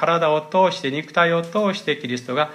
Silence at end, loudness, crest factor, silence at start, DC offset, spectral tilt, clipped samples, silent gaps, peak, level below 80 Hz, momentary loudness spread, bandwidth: 0 s; -20 LUFS; 16 dB; 0 s; under 0.1%; -5 dB/octave; under 0.1%; none; -4 dBFS; -72 dBFS; 6 LU; 13 kHz